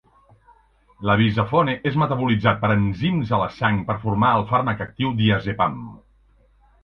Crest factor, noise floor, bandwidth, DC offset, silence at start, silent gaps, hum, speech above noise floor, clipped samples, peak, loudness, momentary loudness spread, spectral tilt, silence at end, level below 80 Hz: 20 dB; -56 dBFS; 5.8 kHz; under 0.1%; 1 s; none; none; 36 dB; under 0.1%; 0 dBFS; -21 LUFS; 6 LU; -9 dB/octave; 0.85 s; -46 dBFS